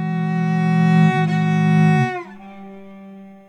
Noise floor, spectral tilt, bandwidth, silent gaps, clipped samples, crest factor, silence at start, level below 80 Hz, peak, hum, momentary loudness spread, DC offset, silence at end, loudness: -39 dBFS; -8 dB/octave; 8.2 kHz; none; under 0.1%; 14 dB; 0 s; -62 dBFS; -4 dBFS; none; 23 LU; under 0.1%; 0.15 s; -17 LUFS